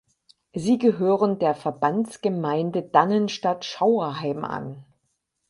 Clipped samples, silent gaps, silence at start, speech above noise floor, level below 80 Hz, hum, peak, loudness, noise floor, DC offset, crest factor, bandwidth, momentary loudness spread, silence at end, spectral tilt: under 0.1%; none; 0.55 s; 52 dB; -66 dBFS; none; -4 dBFS; -23 LUFS; -75 dBFS; under 0.1%; 20 dB; 11.5 kHz; 10 LU; 0.65 s; -6.5 dB/octave